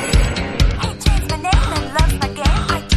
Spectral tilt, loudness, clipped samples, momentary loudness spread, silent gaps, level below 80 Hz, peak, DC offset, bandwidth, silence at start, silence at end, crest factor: -4.5 dB/octave; -18 LUFS; under 0.1%; 2 LU; none; -18 dBFS; -2 dBFS; under 0.1%; 13.5 kHz; 0 s; 0 s; 14 dB